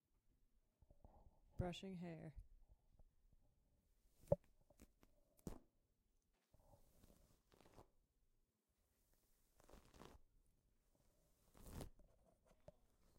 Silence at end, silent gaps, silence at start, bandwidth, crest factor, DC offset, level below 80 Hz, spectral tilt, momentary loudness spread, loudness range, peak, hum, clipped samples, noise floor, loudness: 0.55 s; none; 0.9 s; 16 kHz; 36 dB; under 0.1%; -70 dBFS; -6.5 dB/octave; 21 LU; 14 LU; -22 dBFS; none; under 0.1%; -87 dBFS; -52 LUFS